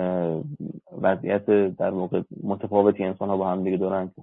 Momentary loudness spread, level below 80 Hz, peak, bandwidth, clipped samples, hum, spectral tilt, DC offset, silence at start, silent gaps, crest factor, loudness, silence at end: 10 LU; -68 dBFS; -4 dBFS; 4 kHz; under 0.1%; none; -11.5 dB/octave; under 0.1%; 0 s; none; 20 dB; -24 LUFS; 0 s